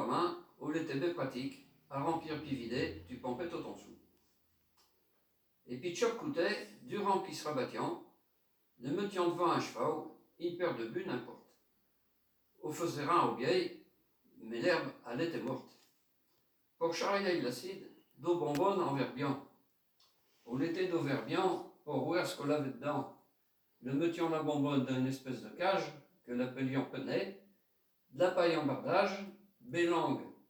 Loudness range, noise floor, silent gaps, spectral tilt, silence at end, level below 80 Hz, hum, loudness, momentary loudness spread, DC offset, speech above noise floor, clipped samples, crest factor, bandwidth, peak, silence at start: 5 LU; -76 dBFS; none; -5.5 dB/octave; 0.15 s; -78 dBFS; none; -36 LUFS; 12 LU; under 0.1%; 40 dB; under 0.1%; 22 dB; over 20 kHz; -16 dBFS; 0 s